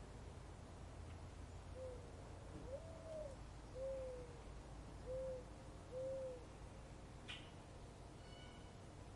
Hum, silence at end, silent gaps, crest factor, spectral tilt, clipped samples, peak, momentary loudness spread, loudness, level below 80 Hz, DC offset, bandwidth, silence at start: none; 0 s; none; 14 dB; -5.5 dB/octave; under 0.1%; -38 dBFS; 9 LU; -54 LUFS; -60 dBFS; under 0.1%; 11.5 kHz; 0 s